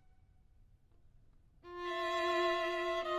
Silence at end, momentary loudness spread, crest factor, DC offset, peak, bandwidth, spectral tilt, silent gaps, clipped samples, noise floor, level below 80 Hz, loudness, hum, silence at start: 0 s; 11 LU; 16 dB; under 0.1%; -22 dBFS; 14.5 kHz; -3 dB/octave; none; under 0.1%; -65 dBFS; -66 dBFS; -35 LUFS; none; 1.65 s